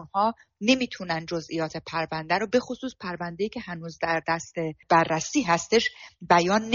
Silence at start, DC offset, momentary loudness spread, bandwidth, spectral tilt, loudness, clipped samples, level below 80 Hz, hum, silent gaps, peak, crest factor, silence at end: 0 s; under 0.1%; 12 LU; 7.4 kHz; -3 dB/octave; -26 LUFS; under 0.1%; -60 dBFS; none; none; -6 dBFS; 20 dB; 0 s